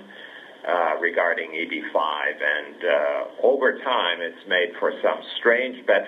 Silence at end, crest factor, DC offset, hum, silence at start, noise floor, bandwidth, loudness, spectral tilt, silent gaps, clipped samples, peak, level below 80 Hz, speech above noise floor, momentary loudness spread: 0 s; 18 dB; under 0.1%; none; 0 s; -42 dBFS; 6.4 kHz; -23 LUFS; -4 dB/octave; none; under 0.1%; -4 dBFS; -86 dBFS; 20 dB; 7 LU